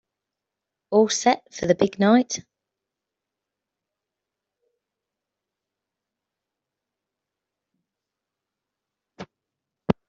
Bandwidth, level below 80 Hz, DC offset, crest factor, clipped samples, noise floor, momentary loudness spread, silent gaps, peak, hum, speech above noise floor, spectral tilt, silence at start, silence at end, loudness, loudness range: 8 kHz; -62 dBFS; under 0.1%; 24 dB; under 0.1%; -86 dBFS; 11 LU; none; -4 dBFS; none; 66 dB; -4.5 dB/octave; 0.9 s; 0.15 s; -21 LUFS; 14 LU